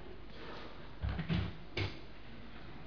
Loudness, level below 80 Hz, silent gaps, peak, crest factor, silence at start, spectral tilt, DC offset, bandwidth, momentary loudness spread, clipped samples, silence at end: -42 LUFS; -48 dBFS; none; -22 dBFS; 18 dB; 0 s; -5 dB/octave; 0.4%; 5.4 kHz; 15 LU; under 0.1%; 0 s